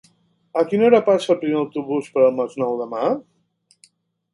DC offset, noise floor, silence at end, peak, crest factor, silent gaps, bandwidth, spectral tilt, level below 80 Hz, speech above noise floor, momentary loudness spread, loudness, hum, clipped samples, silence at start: under 0.1%; -62 dBFS; 1.1 s; 0 dBFS; 20 dB; none; 11 kHz; -6.5 dB/octave; -72 dBFS; 44 dB; 9 LU; -20 LUFS; none; under 0.1%; 0.55 s